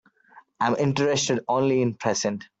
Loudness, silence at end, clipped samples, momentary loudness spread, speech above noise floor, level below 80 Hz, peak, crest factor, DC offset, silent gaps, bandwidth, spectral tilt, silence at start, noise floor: -24 LUFS; 0.15 s; under 0.1%; 4 LU; 31 dB; -64 dBFS; -8 dBFS; 16 dB; under 0.1%; none; 8.2 kHz; -4.5 dB/octave; 0.35 s; -54 dBFS